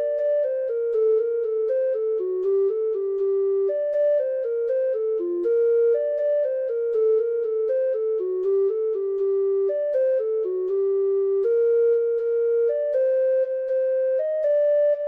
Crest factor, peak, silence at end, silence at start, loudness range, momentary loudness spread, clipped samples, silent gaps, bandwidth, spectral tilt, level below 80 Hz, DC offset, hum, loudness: 8 dB; -14 dBFS; 0 s; 0 s; 2 LU; 5 LU; under 0.1%; none; 3.1 kHz; -7 dB/octave; -76 dBFS; under 0.1%; none; -23 LUFS